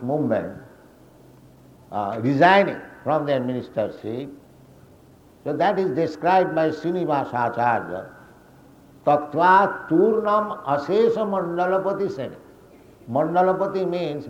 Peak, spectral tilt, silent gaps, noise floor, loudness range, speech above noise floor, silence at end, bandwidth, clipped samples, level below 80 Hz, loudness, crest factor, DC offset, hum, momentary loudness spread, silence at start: -2 dBFS; -7.5 dB/octave; none; -51 dBFS; 4 LU; 30 dB; 0 s; 15.5 kHz; under 0.1%; -62 dBFS; -21 LUFS; 22 dB; under 0.1%; none; 15 LU; 0 s